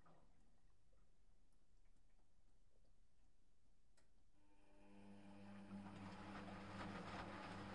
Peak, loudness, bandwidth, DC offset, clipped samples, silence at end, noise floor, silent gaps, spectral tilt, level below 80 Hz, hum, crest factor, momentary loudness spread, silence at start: -38 dBFS; -56 LUFS; 10.5 kHz; under 0.1%; under 0.1%; 0 s; -79 dBFS; none; -6 dB/octave; -74 dBFS; none; 22 dB; 12 LU; 0 s